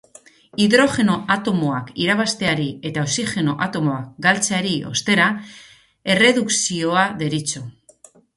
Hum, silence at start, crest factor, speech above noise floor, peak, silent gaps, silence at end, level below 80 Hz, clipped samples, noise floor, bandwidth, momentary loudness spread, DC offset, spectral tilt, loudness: none; 0.55 s; 20 dB; 31 dB; 0 dBFS; none; 0.65 s; -56 dBFS; under 0.1%; -50 dBFS; 11.5 kHz; 10 LU; under 0.1%; -3.5 dB/octave; -19 LUFS